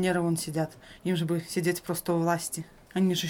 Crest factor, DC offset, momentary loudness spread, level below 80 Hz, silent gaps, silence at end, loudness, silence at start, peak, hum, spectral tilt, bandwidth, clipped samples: 16 dB; under 0.1%; 9 LU; -62 dBFS; none; 0 s; -30 LUFS; 0 s; -14 dBFS; none; -5 dB/octave; 18 kHz; under 0.1%